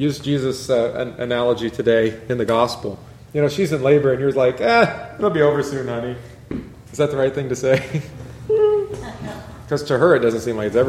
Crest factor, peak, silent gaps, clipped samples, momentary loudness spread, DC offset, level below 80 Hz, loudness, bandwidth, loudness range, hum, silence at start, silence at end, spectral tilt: 18 dB; -2 dBFS; none; under 0.1%; 16 LU; under 0.1%; -48 dBFS; -19 LUFS; 14.5 kHz; 3 LU; none; 0 s; 0 s; -6 dB/octave